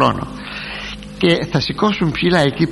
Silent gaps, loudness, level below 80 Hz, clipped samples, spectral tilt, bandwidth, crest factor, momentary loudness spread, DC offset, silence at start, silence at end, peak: none; -18 LUFS; -40 dBFS; under 0.1%; -6 dB/octave; 11.5 kHz; 18 dB; 12 LU; under 0.1%; 0 s; 0 s; 0 dBFS